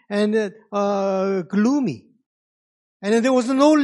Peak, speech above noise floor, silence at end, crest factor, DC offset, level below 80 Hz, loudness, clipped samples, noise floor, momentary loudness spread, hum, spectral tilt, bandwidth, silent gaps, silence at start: -4 dBFS; over 71 dB; 0 s; 18 dB; under 0.1%; -76 dBFS; -20 LUFS; under 0.1%; under -90 dBFS; 9 LU; none; -6 dB/octave; 11.5 kHz; 2.26-3.00 s; 0.1 s